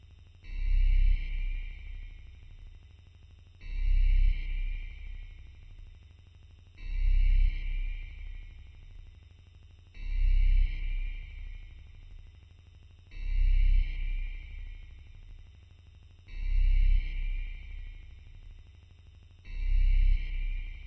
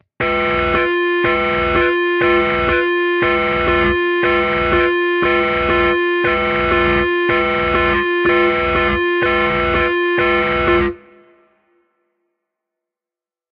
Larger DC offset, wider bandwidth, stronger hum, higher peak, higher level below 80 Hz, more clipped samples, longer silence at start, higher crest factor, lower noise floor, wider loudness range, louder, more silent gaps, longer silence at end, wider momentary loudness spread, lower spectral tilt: neither; second, 4.2 kHz vs 5.2 kHz; first, 50 Hz at -70 dBFS vs none; second, -18 dBFS vs -2 dBFS; about the same, -30 dBFS vs -34 dBFS; neither; first, 0.45 s vs 0.2 s; about the same, 12 dB vs 14 dB; second, -54 dBFS vs -89 dBFS; about the same, 1 LU vs 3 LU; second, -34 LUFS vs -15 LUFS; neither; second, 0 s vs 2.55 s; first, 26 LU vs 2 LU; second, -6.5 dB/octave vs -8 dB/octave